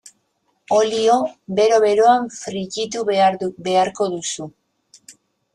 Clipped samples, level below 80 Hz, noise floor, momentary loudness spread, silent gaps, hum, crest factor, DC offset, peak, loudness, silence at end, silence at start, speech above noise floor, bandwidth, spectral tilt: under 0.1%; -64 dBFS; -68 dBFS; 12 LU; none; none; 16 dB; under 0.1%; -4 dBFS; -18 LUFS; 0.45 s; 0.7 s; 50 dB; 11 kHz; -3.5 dB/octave